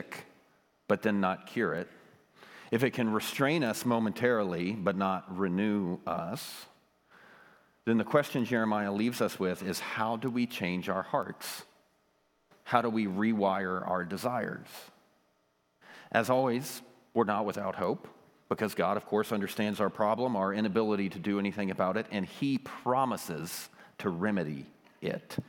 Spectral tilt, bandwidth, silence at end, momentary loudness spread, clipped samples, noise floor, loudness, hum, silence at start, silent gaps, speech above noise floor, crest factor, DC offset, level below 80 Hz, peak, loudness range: -5.5 dB/octave; 19 kHz; 0.05 s; 11 LU; under 0.1%; -73 dBFS; -31 LUFS; none; 0 s; none; 42 dB; 24 dB; under 0.1%; -78 dBFS; -8 dBFS; 3 LU